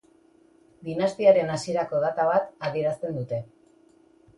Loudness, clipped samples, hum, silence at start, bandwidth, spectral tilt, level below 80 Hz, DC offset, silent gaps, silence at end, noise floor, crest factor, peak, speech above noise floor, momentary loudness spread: -25 LUFS; under 0.1%; none; 0.8 s; 11.5 kHz; -6 dB/octave; -66 dBFS; under 0.1%; none; 0.95 s; -59 dBFS; 20 dB; -6 dBFS; 34 dB; 13 LU